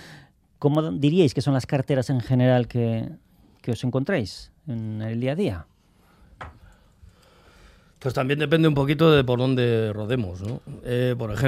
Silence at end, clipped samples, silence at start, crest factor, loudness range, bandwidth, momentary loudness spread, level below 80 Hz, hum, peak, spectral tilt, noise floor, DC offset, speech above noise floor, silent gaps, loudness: 0 s; under 0.1%; 0 s; 20 dB; 10 LU; 14 kHz; 15 LU; -52 dBFS; none; -4 dBFS; -7.5 dB/octave; -58 dBFS; under 0.1%; 36 dB; none; -23 LUFS